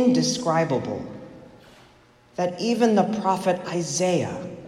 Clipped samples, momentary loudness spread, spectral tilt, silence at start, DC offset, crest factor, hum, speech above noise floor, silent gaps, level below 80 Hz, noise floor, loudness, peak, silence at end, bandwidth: under 0.1%; 16 LU; -5 dB/octave; 0 s; under 0.1%; 16 dB; none; 32 dB; none; -62 dBFS; -54 dBFS; -23 LUFS; -8 dBFS; 0 s; 14.5 kHz